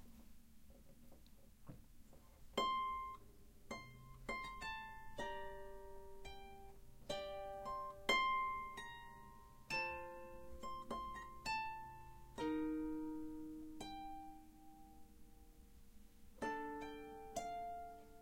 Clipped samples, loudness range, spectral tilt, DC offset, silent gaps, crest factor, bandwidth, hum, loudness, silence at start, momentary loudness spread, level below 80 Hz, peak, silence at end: under 0.1%; 9 LU; -3.5 dB/octave; under 0.1%; none; 24 dB; 16.5 kHz; none; -46 LUFS; 0 s; 25 LU; -64 dBFS; -24 dBFS; 0 s